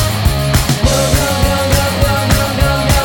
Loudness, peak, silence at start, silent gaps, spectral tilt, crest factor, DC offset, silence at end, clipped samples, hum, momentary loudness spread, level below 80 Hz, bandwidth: -13 LUFS; 0 dBFS; 0 s; none; -4.5 dB/octave; 12 dB; under 0.1%; 0 s; under 0.1%; none; 2 LU; -18 dBFS; 17.5 kHz